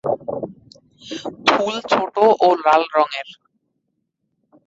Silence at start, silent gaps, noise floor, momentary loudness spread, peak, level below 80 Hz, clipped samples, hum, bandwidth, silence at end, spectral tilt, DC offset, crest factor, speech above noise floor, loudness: 0.05 s; none; -73 dBFS; 17 LU; -2 dBFS; -64 dBFS; under 0.1%; none; 7.8 kHz; 1.35 s; -4 dB/octave; under 0.1%; 18 dB; 55 dB; -17 LUFS